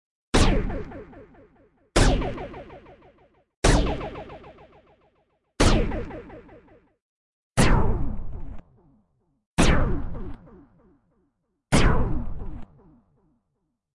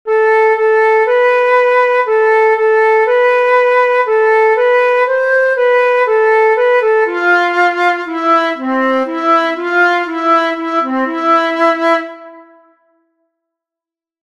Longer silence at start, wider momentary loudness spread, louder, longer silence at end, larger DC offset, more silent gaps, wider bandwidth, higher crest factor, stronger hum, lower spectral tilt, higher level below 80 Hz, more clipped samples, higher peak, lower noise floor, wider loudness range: first, 0.35 s vs 0.05 s; first, 23 LU vs 4 LU; second, -25 LUFS vs -11 LUFS; second, 1.35 s vs 1.8 s; neither; first, 3.57-3.62 s, 7.02-7.54 s, 9.46-9.57 s vs none; first, 11.5 kHz vs 9.8 kHz; first, 18 dB vs 10 dB; neither; first, -5 dB/octave vs -2.5 dB/octave; first, -30 dBFS vs -68 dBFS; neither; second, -6 dBFS vs -2 dBFS; second, -77 dBFS vs -87 dBFS; about the same, 3 LU vs 4 LU